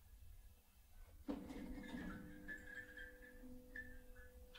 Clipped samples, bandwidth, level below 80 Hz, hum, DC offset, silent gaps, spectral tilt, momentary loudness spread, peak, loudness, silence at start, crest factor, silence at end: under 0.1%; 16 kHz; -62 dBFS; none; under 0.1%; none; -5.5 dB/octave; 14 LU; -34 dBFS; -54 LUFS; 0 s; 22 dB; 0 s